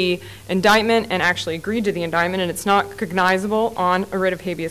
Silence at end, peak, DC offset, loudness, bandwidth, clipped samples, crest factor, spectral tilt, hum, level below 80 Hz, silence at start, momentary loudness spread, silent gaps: 0 s; -6 dBFS; 0.3%; -19 LUFS; 16 kHz; under 0.1%; 14 dB; -4.5 dB/octave; none; -50 dBFS; 0 s; 8 LU; none